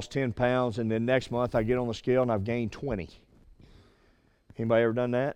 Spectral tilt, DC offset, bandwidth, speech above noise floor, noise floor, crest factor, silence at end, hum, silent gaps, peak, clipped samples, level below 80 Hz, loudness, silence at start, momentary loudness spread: -7 dB/octave; under 0.1%; 10 kHz; 37 dB; -64 dBFS; 16 dB; 0 s; none; none; -12 dBFS; under 0.1%; -52 dBFS; -28 LUFS; 0 s; 9 LU